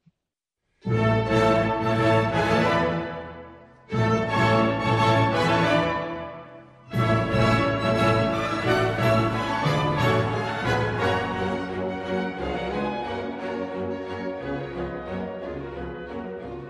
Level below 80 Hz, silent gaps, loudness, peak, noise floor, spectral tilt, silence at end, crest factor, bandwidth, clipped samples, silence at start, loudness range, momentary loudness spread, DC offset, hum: -46 dBFS; none; -24 LUFS; -8 dBFS; -85 dBFS; -6.5 dB/octave; 0 s; 16 dB; 12.5 kHz; under 0.1%; 0.85 s; 7 LU; 13 LU; under 0.1%; none